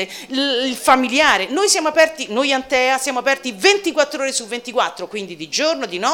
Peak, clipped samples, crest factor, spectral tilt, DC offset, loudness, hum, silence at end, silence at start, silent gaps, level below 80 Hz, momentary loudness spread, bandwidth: -2 dBFS; under 0.1%; 16 dB; -1 dB/octave; under 0.1%; -17 LUFS; none; 0 s; 0 s; none; -56 dBFS; 9 LU; 17.5 kHz